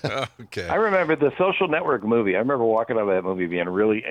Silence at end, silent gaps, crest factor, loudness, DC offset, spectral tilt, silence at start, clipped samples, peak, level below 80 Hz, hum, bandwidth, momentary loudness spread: 0 s; none; 14 dB; -22 LUFS; under 0.1%; -6.5 dB/octave; 0.05 s; under 0.1%; -8 dBFS; -62 dBFS; none; 10 kHz; 6 LU